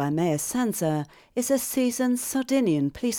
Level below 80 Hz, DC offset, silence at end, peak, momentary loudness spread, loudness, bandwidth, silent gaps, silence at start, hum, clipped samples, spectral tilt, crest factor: -60 dBFS; under 0.1%; 0 s; -12 dBFS; 5 LU; -25 LUFS; 19.5 kHz; none; 0 s; none; under 0.1%; -5 dB/octave; 14 dB